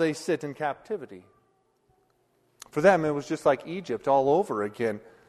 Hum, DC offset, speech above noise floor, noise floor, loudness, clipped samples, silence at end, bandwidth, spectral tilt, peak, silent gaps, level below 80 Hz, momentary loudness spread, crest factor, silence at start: none; under 0.1%; 43 dB; -69 dBFS; -26 LUFS; under 0.1%; 0.3 s; 13 kHz; -6 dB/octave; -6 dBFS; none; -66 dBFS; 13 LU; 20 dB; 0 s